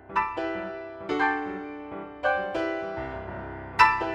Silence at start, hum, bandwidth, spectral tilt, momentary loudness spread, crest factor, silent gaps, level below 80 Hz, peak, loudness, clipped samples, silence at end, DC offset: 0 s; none; 12 kHz; -5 dB/octave; 16 LU; 24 dB; none; -52 dBFS; -4 dBFS; -28 LUFS; under 0.1%; 0 s; under 0.1%